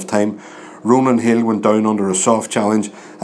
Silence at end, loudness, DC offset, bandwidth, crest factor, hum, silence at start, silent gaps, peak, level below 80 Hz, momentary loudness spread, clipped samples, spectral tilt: 0 s; -16 LUFS; under 0.1%; 11 kHz; 16 dB; none; 0 s; none; 0 dBFS; -68 dBFS; 12 LU; under 0.1%; -5 dB/octave